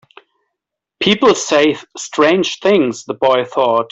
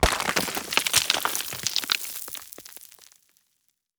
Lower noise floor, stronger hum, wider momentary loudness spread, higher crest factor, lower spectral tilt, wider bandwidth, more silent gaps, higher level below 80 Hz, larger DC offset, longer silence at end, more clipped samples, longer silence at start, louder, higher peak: first, -79 dBFS vs -73 dBFS; neither; second, 6 LU vs 20 LU; second, 14 dB vs 24 dB; first, -4 dB/octave vs -1 dB/octave; second, 8.2 kHz vs over 20 kHz; neither; second, -56 dBFS vs -40 dBFS; neither; second, 0.05 s vs 0.95 s; neither; first, 1 s vs 0 s; first, -14 LUFS vs -24 LUFS; about the same, -2 dBFS vs -4 dBFS